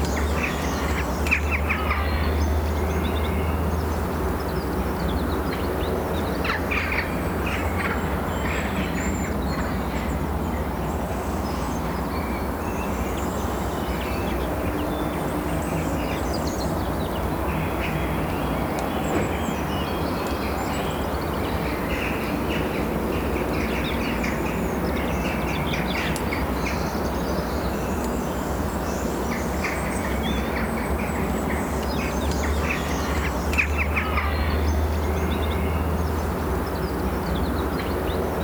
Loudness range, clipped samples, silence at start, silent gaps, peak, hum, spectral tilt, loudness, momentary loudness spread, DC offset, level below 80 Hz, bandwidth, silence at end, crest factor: 3 LU; under 0.1%; 0 s; none; -8 dBFS; none; -6 dB/octave; -25 LUFS; 3 LU; under 0.1%; -32 dBFS; over 20 kHz; 0 s; 16 dB